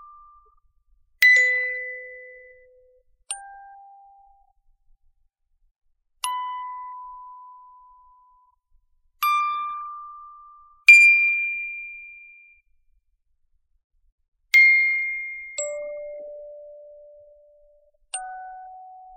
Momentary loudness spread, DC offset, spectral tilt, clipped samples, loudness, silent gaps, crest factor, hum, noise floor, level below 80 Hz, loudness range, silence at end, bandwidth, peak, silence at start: 26 LU; under 0.1%; 3 dB/octave; under 0.1%; -17 LUFS; 5.71-5.75 s, 13.84-13.90 s, 14.12-14.18 s, 14.28-14.32 s; 24 dB; none; -68 dBFS; -66 dBFS; 22 LU; 0.25 s; 10 kHz; -2 dBFS; 1.2 s